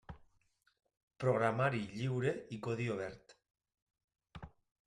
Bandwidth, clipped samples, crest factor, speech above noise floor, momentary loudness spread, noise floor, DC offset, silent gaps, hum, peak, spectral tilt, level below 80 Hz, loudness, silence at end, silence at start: 11 kHz; under 0.1%; 20 dB; 40 dB; 24 LU; -76 dBFS; under 0.1%; 1.03-1.08 s, 3.82-3.87 s, 4.04-4.08 s; none; -20 dBFS; -7 dB/octave; -68 dBFS; -37 LUFS; 0.4 s; 0.1 s